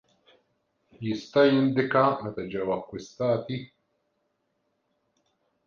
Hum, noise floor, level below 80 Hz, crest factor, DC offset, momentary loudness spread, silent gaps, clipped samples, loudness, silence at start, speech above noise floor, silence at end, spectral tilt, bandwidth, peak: none; -76 dBFS; -66 dBFS; 20 dB; under 0.1%; 15 LU; none; under 0.1%; -26 LUFS; 1 s; 50 dB; 2 s; -7 dB/octave; 7.2 kHz; -8 dBFS